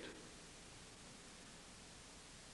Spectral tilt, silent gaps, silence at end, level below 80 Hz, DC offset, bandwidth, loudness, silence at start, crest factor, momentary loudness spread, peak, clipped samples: -2.5 dB/octave; none; 0 s; -68 dBFS; under 0.1%; 11.5 kHz; -57 LUFS; 0 s; 20 dB; 1 LU; -38 dBFS; under 0.1%